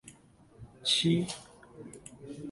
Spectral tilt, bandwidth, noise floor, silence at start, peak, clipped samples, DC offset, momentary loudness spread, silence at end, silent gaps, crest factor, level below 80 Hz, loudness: -4 dB/octave; 11.5 kHz; -59 dBFS; 0.05 s; -14 dBFS; under 0.1%; under 0.1%; 23 LU; 0 s; none; 20 dB; -64 dBFS; -29 LUFS